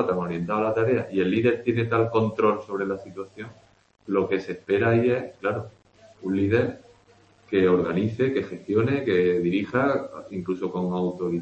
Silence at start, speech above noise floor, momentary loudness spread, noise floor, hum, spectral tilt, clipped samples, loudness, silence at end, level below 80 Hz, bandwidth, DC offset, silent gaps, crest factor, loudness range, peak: 0 s; 33 dB; 12 LU; -57 dBFS; none; -8.5 dB/octave; under 0.1%; -24 LUFS; 0 s; -60 dBFS; 8.2 kHz; under 0.1%; none; 18 dB; 3 LU; -6 dBFS